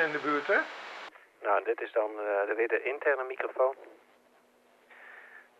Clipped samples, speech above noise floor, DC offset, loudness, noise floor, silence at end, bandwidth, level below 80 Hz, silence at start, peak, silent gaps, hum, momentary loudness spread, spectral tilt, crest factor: under 0.1%; 34 dB; under 0.1%; -30 LUFS; -64 dBFS; 0.2 s; 8.6 kHz; under -90 dBFS; 0 s; -14 dBFS; none; none; 19 LU; -4.5 dB/octave; 18 dB